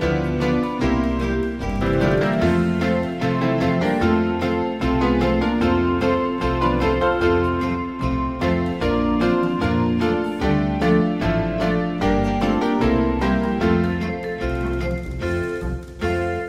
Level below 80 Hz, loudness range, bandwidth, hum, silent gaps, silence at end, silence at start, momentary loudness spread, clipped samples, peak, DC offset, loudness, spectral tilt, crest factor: -32 dBFS; 1 LU; 12 kHz; none; none; 0 s; 0 s; 6 LU; under 0.1%; -6 dBFS; 0.3%; -21 LUFS; -7.5 dB/octave; 14 dB